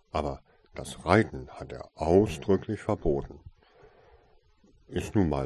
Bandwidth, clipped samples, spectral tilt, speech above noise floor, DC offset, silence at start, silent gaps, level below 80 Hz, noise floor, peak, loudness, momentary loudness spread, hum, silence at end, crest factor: 12.5 kHz; under 0.1%; -7 dB/octave; 34 dB; under 0.1%; 0.15 s; none; -44 dBFS; -62 dBFS; -6 dBFS; -28 LUFS; 18 LU; none; 0 s; 22 dB